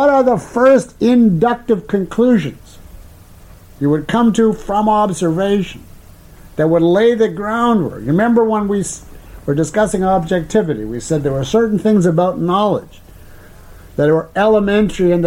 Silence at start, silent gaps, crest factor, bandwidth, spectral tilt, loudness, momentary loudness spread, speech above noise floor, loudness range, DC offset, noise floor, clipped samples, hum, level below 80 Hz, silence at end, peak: 0 s; none; 12 dB; 16 kHz; -6.5 dB/octave; -15 LUFS; 8 LU; 26 dB; 2 LU; under 0.1%; -40 dBFS; under 0.1%; none; -40 dBFS; 0 s; -2 dBFS